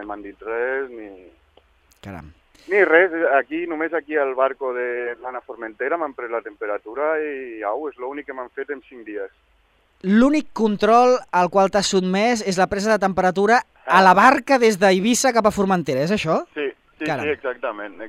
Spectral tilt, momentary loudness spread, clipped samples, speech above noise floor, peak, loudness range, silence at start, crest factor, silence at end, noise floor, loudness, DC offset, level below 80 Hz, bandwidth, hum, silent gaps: -4.5 dB/octave; 17 LU; under 0.1%; 41 dB; 0 dBFS; 10 LU; 0 s; 20 dB; 0 s; -60 dBFS; -19 LUFS; under 0.1%; -54 dBFS; 15.5 kHz; none; none